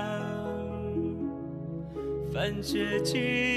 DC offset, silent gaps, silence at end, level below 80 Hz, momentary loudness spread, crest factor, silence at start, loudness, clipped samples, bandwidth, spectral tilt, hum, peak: under 0.1%; none; 0 s; -52 dBFS; 10 LU; 16 dB; 0 s; -32 LUFS; under 0.1%; 13.5 kHz; -5 dB/octave; none; -16 dBFS